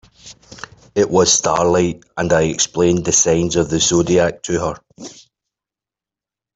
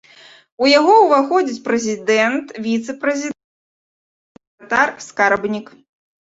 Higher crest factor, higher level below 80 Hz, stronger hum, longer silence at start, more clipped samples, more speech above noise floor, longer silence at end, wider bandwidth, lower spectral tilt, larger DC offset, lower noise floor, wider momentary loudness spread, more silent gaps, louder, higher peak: about the same, 16 dB vs 16 dB; first, -46 dBFS vs -64 dBFS; neither; second, 0.25 s vs 0.6 s; neither; first, 73 dB vs 30 dB; first, 1.45 s vs 0.55 s; about the same, 8.4 kHz vs 8 kHz; about the same, -3.5 dB/octave vs -3.5 dB/octave; neither; first, -88 dBFS vs -46 dBFS; first, 22 LU vs 13 LU; second, none vs 3.44-4.35 s, 4.47-4.58 s; about the same, -16 LUFS vs -16 LUFS; about the same, -2 dBFS vs -2 dBFS